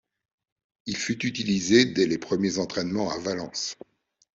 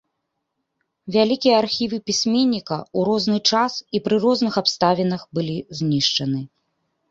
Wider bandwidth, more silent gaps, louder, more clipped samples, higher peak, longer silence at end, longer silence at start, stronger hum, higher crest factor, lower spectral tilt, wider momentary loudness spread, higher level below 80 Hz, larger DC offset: about the same, 8 kHz vs 7.8 kHz; neither; second, -26 LUFS vs -20 LUFS; neither; second, -6 dBFS vs -2 dBFS; about the same, 0.6 s vs 0.65 s; second, 0.85 s vs 1.05 s; neither; about the same, 22 dB vs 20 dB; about the same, -4 dB/octave vs -4.5 dB/octave; first, 13 LU vs 8 LU; about the same, -62 dBFS vs -60 dBFS; neither